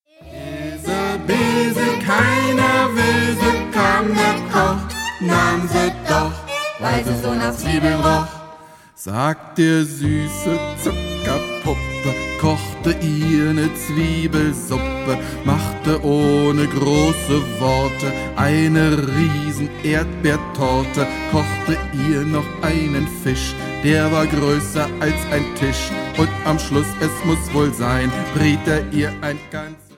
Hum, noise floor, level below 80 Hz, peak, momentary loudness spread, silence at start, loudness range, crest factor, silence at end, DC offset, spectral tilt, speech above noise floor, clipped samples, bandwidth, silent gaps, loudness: none; -42 dBFS; -34 dBFS; -2 dBFS; 7 LU; 0.2 s; 4 LU; 16 dB; 0.2 s; under 0.1%; -5.5 dB/octave; 23 dB; under 0.1%; 16.5 kHz; none; -19 LUFS